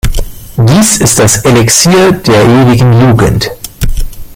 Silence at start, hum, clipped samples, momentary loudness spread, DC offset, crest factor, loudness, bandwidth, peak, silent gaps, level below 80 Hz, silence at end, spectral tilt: 0.05 s; none; 0.4%; 12 LU; under 0.1%; 6 dB; -6 LUFS; over 20 kHz; 0 dBFS; none; -18 dBFS; 0 s; -4.5 dB/octave